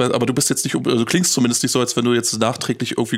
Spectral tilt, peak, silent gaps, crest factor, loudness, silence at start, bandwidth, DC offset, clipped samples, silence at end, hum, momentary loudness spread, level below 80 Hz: -3.5 dB/octave; -2 dBFS; none; 16 dB; -18 LUFS; 0 s; 16 kHz; under 0.1%; under 0.1%; 0 s; none; 5 LU; -60 dBFS